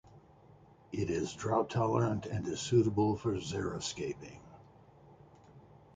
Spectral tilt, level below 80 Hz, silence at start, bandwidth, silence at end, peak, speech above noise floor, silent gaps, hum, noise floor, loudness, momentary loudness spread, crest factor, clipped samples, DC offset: -6 dB/octave; -58 dBFS; 0.15 s; 9.4 kHz; 0.35 s; -16 dBFS; 27 dB; none; none; -60 dBFS; -34 LUFS; 12 LU; 20 dB; under 0.1%; under 0.1%